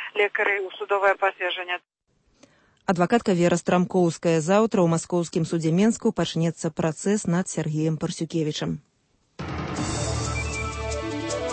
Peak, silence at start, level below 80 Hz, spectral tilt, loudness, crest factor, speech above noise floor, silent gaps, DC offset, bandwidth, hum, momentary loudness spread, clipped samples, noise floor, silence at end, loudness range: -8 dBFS; 0 s; -44 dBFS; -5.5 dB/octave; -24 LUFS; 16 dB; 44 dB; none; under 0.1%; 8.8 kHz; none; 9 LU; under 0.1%; -67 dBFS; 0 s; 6 LU